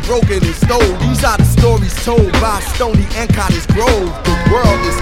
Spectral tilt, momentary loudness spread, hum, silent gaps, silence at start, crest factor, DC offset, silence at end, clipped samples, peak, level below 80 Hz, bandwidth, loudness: -5.5 dB/octave; 4 LU; none; none; 0 s; 12 dB; under 0.1%; 0 s; 0.2%; 0 dBFS; -18 dBFS; 16.5 kHz; -13 LUFS